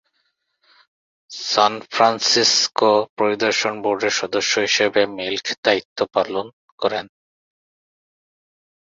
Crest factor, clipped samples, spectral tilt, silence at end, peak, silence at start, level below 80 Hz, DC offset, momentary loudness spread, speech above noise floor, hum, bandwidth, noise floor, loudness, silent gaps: 20 dB; under 0.1%; -1.5 dB/octave; 1.85 s; -2 dBFS; 1.3 s; -64 dBFS; under 0.1%; 10 LU; 51 dB; none; 7.8 kHz; -70 dBFS; -19 LUFS; 3.10-3.17 s, 5.58-5.63 s, 5.85-5.96 s, 6.53-6.78 s